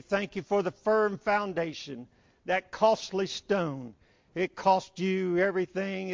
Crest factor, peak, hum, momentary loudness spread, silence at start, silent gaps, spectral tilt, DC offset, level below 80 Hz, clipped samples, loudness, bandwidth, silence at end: 18 dB; -10 dBFS; none; 15 LU; 0.1 s; none; -5.5 dB/octave; under 0.1%; -66 dBFS; under 0.1%; -29 LUFS; 7.6 kHz; 0 s